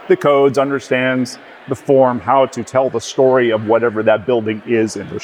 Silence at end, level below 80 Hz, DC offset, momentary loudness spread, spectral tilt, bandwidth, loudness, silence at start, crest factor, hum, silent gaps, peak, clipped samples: 0 s; -62 dBFS; under 0.1%; 8 LU; -5.5 dB/octave; 12.5 kHz; -15 LUFS; 0 s; 14 dB; none; none; -2 dBFS; under 0.1%